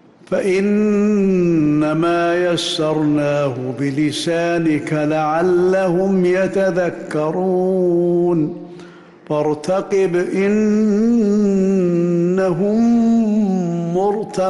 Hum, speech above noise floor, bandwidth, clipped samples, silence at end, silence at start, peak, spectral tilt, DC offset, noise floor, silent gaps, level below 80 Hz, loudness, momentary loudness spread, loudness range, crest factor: none; 24 dB; 12 kHz; under 0.1%; 0 s; 0.3 s; -8 dBFS; -7 dB/octave; under 0.1%; -39 dBFS; none; -52 dBFS; -17 LUFS; 5 LU; 3 LU; 8 dB